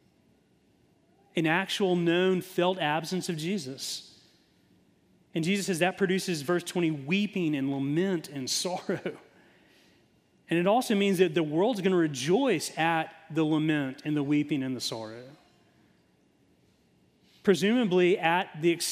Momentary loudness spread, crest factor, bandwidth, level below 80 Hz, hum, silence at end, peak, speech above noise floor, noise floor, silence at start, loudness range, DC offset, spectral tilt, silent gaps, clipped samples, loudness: 9 LU; 20 dB; 15.5 kHz; -76 dBFS; none; 0 s; -10 dBFS; 38 dB; -66 dBFS; 1.35 s; 6 LU; under 0.1%; -5 dB/octave; none; under 0.1%; -28 LUFS